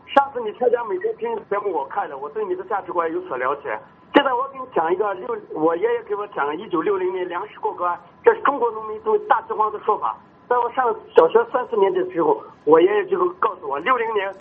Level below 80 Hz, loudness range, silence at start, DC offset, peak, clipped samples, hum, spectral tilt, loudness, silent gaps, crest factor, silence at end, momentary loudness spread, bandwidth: -68 dBFS; 5 LU; 0.1 s; under 0.1%; 0 dBFS; under 0.1%; none; -2.5 dB/octave; -21 LUFS; none; 20 dB; 0 s; 10 LU; 4.3 kHz